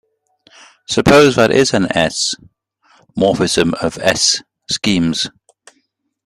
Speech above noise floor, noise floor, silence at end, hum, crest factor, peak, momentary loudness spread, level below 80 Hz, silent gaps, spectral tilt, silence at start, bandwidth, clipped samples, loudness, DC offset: 51 dB; -65 dBFS; 0.95 s; none; 16 dB; 0 dBFS; 11 LU; -44 dBFS; none; -3.5 dB/octave; 0.9 s; 15.5 kHz; under 0.1%; -14 LUFS; under 0.1%